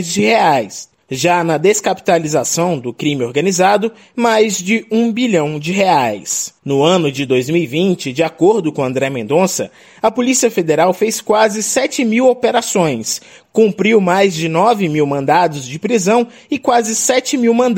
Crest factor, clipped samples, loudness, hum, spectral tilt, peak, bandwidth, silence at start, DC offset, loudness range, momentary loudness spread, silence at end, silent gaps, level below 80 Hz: 14 dB; under 0.1%; -14 LUFS; none; -4 dB/octave; 0 dBFS; 16.5 kHz; 0 s; under 0.1%; 1 LU; 6 LU; 0 s; none; -58 dBFS